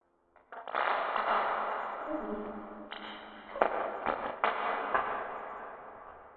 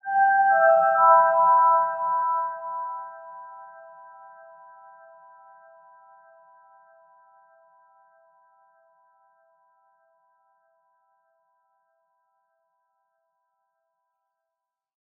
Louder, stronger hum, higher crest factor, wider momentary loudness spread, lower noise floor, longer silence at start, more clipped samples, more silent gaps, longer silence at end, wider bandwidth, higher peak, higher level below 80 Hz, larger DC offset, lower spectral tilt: second, -34 LUFS vs -20 LUFS; neither; first, 26 dB vs 20 dB; second, 16 LU vs 26 LU; second, -66 dBFS vs -86 dBFS; first, 0.5 s vs 0.05 s; neither; neither; second, 0 s vs 11.35 s; first, 4.8 kHz vs 3.2 kHz; about the same, -8 dBFS vs -6 dBFS; first, -66 dBFS vs under -90 dBFS; neither; first, -1 dB/octave vs 7.5 dB/octave